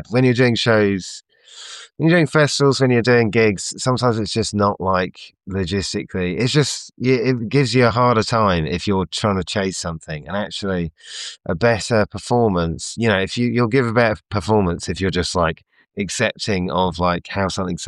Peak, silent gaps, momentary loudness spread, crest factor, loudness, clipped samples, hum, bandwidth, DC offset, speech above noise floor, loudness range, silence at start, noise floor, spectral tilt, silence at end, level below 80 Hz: -4 dBFS; none; 12 LU; 14 dB; -19 LUFS; under 0.1%; none; 12 kHz; under 0.1%; 21 dB; 4 LU; 0 s; -39 dBFS; -5 dB/octave; 0 s; -46 dBFS